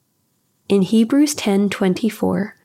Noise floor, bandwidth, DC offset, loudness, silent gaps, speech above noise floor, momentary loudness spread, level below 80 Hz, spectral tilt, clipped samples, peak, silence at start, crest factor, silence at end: -66 dBFS; 15.5 kHz; under 0.1%; -18 LUFS; none; 49 dB; 5 LU; -62 dBFS; -5.5 dB/octave; under 0.1%; -4 dBFS; 0.7 s; 14 dB; 0.15 s